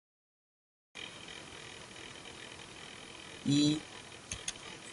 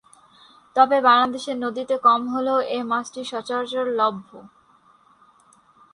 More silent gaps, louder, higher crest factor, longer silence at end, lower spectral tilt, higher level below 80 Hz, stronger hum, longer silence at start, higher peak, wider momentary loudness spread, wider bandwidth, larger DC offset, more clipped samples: neither; second, -38 LUFS vs -21 LUFS; about the same, 22 dB vs 20 dB; second, 0 s vs 1.45 s; about the same, -4 dB/octave vs -3.5 dB/octave; about the same, -66 dBFS vs -70 dBFS; neither; first, 0.95 s vs 0.75 s; second, -18 dBFS vs -2 dBFS; first, 18 LU vs 11 LU; about the same, 11.5 kHz vs 11 kHz; neither; neither